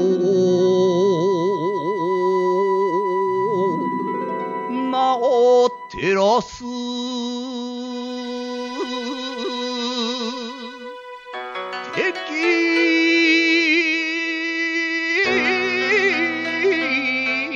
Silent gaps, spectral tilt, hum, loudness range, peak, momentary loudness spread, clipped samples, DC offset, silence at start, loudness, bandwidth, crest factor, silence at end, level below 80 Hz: none; -4.5 dB/octave; none; 9 LU; -6 dBFS; 13 LU; under 0.1%; under 0.1%; 0 s; -19 LUFS; 7.6 kHz; 14 dB; 0 s; -60 dBFS